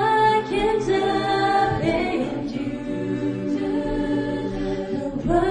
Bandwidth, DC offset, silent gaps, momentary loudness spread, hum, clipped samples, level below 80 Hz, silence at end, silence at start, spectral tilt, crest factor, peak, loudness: 10 kHz; under 0.1%; none; 8 LU; none; under 0.1%; -40 dBFS; 0 s; 0 s; -6.5 dB/octave; 14 dB; -8 dBFS; -23 LUFS